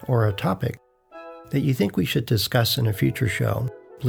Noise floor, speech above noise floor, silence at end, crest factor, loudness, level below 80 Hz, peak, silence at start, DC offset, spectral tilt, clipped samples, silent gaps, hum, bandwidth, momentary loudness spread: -43 dBFS; 21 dB; 0 s; 18 dB; -23 LUFS; -52 dBFS; -6 dBFS; 0 s; under 0.1%; -5.5 dB/octave; under 0.1%; none; none; over 20 kHz; 16 LU